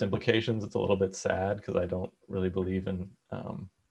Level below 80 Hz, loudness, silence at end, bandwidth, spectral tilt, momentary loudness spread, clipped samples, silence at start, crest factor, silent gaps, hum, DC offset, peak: -62 dBFS; -31 LUFS; 0.2 s; 10 kHz; -6 dB/octave; 13 LU; under 0.1%; 0 s; 22 dB; none; none; under 0.1%; -8 dBFS